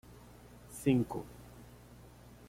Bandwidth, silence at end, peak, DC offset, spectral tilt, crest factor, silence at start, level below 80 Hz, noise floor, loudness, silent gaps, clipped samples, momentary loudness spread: 16.5 kHz; 0.85 s; -16 dBFS; under 0.1%; -7 dB/octave; 22 dB; 0.1 s; -60 dBFS; -56 dBFS; -34 LUFS; none; under 0.1%; 25 LU